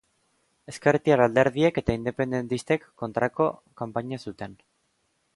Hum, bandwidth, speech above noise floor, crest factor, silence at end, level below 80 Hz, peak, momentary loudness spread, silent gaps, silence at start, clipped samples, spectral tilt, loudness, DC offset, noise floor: none; 11.5 kHz; 47 dB; 20 dB; 0.8 s; -52 dBFS; -6 dBFS; 16 LU; none; 0.7 s; under 0.1%; -6.5 dB/octave; -25 LUFS; under 0.1%; -72 dBFS